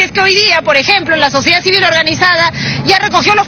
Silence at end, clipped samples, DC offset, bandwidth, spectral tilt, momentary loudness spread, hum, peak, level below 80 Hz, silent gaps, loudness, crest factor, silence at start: 0 s; 0.3%; under 0.1%; over 20 kHz; -3 dB/octave; 3 LU; none; 0 dBFS; -42 dBFS; none; -8 LUFS; 10 dB; 0 s